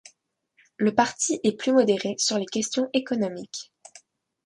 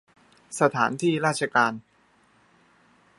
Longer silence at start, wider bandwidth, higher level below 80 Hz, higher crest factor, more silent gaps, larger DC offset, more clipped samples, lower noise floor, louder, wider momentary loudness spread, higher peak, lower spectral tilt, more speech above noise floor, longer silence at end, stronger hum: first, 0.8 s vs 0.5 s; about the same, 11.5 kHz vs 11.5 kHz; about the same, -70 dBFS vs -74 dBFS; about the same, 20 dB vs 24 dB; neither; neither; neither; first, -67 dBFS vs -62 dBFS; about the same, -24 LUFS vs -24 LUFS; first, 14 LU vs 10 LU; about the same, -6 dBFS vs -4 dBFS; about the same, -3.5 dB/octave vs -4.5 dB/octave; first, 43 dB vs 38 dB; second, 0.85 s vs 1.4 s; neither